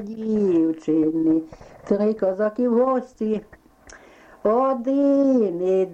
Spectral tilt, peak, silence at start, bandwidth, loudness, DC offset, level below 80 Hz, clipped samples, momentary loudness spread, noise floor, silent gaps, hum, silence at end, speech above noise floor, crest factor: -8.5 dB/octave; -8 dBFS; 0 s; 8 kHz; -21 LUFS; under 0.1%; -58 dBFS; under 0.1%; 8 LU; -48 dBFS; none; none; 0 s; 27 dB; 12 dB